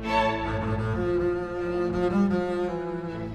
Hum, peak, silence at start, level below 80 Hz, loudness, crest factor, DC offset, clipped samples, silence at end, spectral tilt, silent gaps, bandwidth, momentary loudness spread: none; -10 dBFS; 0 s; -42 dBFS; -27 LUFS; 16 dB; under 0.1%; under 0.1%; 0 s; -7.5 dB/octave; none; 9 kHz; 6 LU